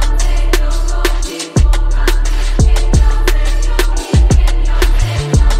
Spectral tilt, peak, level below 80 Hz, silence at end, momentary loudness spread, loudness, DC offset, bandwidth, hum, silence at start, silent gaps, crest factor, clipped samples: -5 dB/octave; 0 dBFS; -10 dBFS; 0 s; 5 LU; -15 LUFS; under 0.1%; 15 kHz; none; 0 s; none; 10 dB; under 0.1%